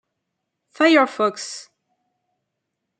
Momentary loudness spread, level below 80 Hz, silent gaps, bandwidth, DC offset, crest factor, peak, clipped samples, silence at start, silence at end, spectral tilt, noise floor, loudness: 17 LU; -78 dBFS; none; 9.4 kHz; under 0.1%; 20 dB; -4 dBFS; under 0.1%; 0.8 s; 1.4 s; -3 dB/octave; -79 dBFS; -18 LUFS